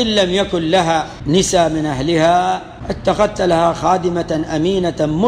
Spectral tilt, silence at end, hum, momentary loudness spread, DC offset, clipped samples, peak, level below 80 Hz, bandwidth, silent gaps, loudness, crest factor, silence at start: -5 dB/octave; 0 s; none; 6 LU; under 0.1%; under 0.1%; -2 dBFS; -38 dBFS; 14.5 kHz; none; -16 LUFS; 12 dB; 0 s